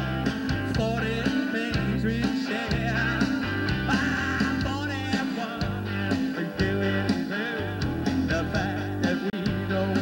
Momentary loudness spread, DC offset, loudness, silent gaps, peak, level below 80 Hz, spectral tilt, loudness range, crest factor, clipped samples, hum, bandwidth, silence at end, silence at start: 4 LU; under 0.1%; -27 LUFS; none; -12 dBFS; -42 dBFS; -6 dB/octave; 2 LU; 14 dB; under 0.1%; none; 16 kHz; 0 s; 0 s